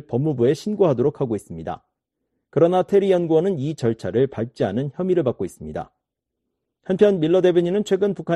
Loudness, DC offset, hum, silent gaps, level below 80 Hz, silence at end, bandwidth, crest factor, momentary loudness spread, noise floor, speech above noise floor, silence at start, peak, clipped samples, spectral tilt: -20 LUFS; under 0.1%; none; none; -56 dBFS; 0 s; 12 kHz; 18 dB; 15 LU; -80 dBFS; 61 dB; 0.1 s; -4 dBFS; under 0.1%; -7.5 dB/octave